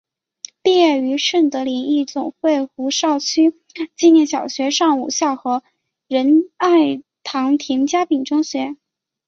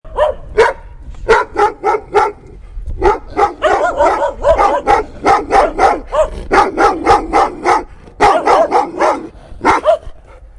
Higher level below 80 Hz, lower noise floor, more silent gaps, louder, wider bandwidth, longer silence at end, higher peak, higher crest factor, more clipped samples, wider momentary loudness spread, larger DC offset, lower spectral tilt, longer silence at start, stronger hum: second, -66 dBFS vs -30 dBFS; first, -40 dBFS vs -33 dBFS; neither; second, -17 LUFS vs -13 LUFS; second, 7.6 kHz vs 11.5 kHz; first, 0.55 s vs 0.1 s; about the same, -2 dBFS vs 0 dBFS; about the same, 14 dB vs 14 dB; neither; first, 11 LU vs 6 LU; neither; second, -2.5 dB/octave vs -4.5 dB/octave; first, 0.65 s vs 0.05 s; neither